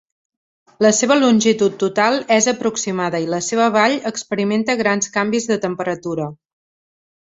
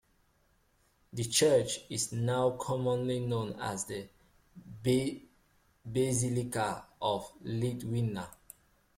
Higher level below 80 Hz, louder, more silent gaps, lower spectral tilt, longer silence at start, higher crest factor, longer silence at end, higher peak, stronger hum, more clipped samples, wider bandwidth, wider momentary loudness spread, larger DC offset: about the same, -62 dBFS vs -62 dBFS; first, -17 LUFS vs -32 LUFS; neither; about the same, -3.5 dB/octave vs -4.5 dB/octave; second, 0.8 s vs 1.15 s; about the same, 16 dB vs 20 dB; first, 0.9 s vs 0.65 s; first, -2 dBFS vs -14 dBFS; neither; neither; second, 8 kHz vs 16 kHz; second, 9 LU vs 14 LU; neither